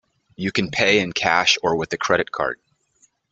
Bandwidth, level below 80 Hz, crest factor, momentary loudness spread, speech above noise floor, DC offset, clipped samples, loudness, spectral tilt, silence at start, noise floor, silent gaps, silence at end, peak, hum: 8.4 kHz; -56 dBFS; 20 dB; 10 LU; 41 dB; under 0.1%; under 0.1%; -20 LUFS; -3 dB/octave; 0.4 s; -62 dBFS; none; 0.8 s; -2 dBFS; none